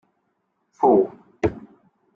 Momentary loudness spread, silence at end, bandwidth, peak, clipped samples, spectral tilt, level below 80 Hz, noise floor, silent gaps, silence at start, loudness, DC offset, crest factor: 9 LU; 0.55 s; 6.8 kHz; -4 dBFS; under 0.1%; -9 dB/octave; -52 dBFS; -72 dBFS; none; 0.8 s; -21 LUFS; under 0.1%; 20 dB